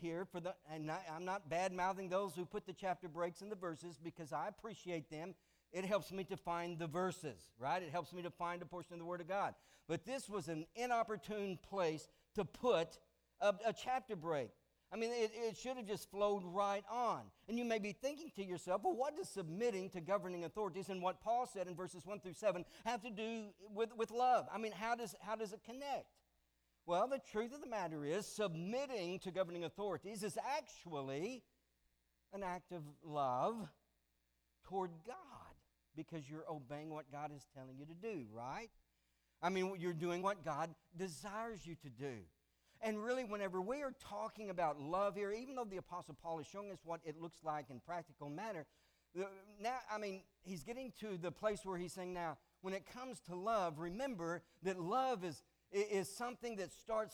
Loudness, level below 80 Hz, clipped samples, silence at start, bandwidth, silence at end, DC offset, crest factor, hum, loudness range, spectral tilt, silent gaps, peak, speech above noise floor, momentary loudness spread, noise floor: -44 LUFS; -74 dBFS; under 0.1%; 0 s; over 20 kHz; 0 s; under 0.1%; 20 dB; none; 6 LU; -5 dB/octave; none; -24 dBFS; 40 dB; 11 LU; -83 dBFS